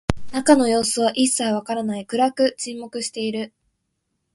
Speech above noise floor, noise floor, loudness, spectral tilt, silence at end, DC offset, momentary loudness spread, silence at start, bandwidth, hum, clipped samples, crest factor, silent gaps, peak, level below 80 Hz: 54 dB; -74 dBFS; -21 LUFS; -3.5 dB/octave; 0.85 s; under 0.1%; 13 LU; 0.1 s; 12 kHz; none; under 0.1%; 22 dB; none; 0 dBFS; -46 dBFS